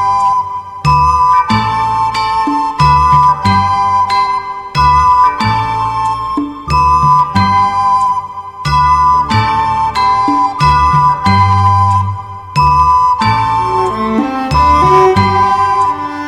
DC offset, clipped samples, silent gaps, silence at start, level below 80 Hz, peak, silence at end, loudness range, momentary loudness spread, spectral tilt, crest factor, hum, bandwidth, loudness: under 0.1%; under 0.1%; none; 0 s; -28 dBFS; 0 dBFS; 0 s; 1 LU; 7 LU; -6 dB/octave; 10 dB; none; 11.5 kHz; -11 LUFS